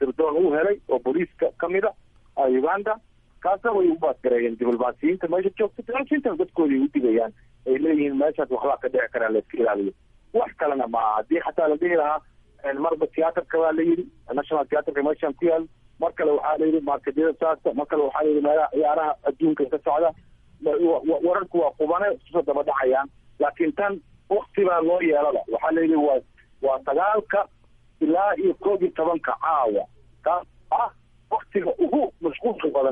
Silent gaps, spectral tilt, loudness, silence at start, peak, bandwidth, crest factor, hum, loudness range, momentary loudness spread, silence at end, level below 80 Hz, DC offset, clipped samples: none; -9 dB/octave; -23 LUFS; 0 s; -10 dBFS; 3.7 kHz; 14 dB; none; 2 LU; 6 LU; 0 s; -58 dBFS; under 0.1%; under 0.1%